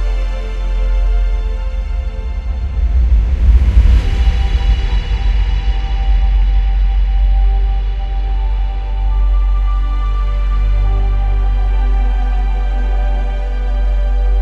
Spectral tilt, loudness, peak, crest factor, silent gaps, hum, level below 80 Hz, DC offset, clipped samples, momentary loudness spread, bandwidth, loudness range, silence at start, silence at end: -7 dB/octave; -17 LUFS; 0 dBFS; 12 dB; none; none; -12 dBFS; under 0.1%; under 0.1%; 7 LU; 5.2 kHz; 3 LU; 0 s; 0 s